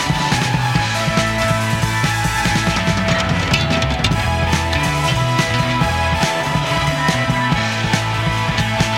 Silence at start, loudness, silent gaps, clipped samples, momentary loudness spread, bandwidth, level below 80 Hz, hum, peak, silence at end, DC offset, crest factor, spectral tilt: 0 s; -17 LUFS; none; under 0.1%; 1 LU; 16 kHz; -30 dBFS; none; -2 dBFS; 0 s; under 0.1%; 16 dB; -4.5 dB/octave